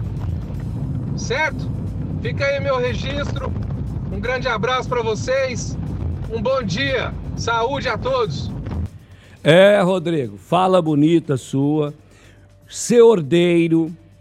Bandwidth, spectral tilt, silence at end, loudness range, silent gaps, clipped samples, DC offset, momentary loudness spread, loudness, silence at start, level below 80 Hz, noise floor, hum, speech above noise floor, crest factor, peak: 14 kHz; -6 dB/octave; 0.25 s; 6 LU; none; under 0.1%; under 0.1%; 13 LU; -19 LUFS; 0 s; -36 dBFS; -47 dBFS; none; 29 dB; 18 dB; 0 dBFS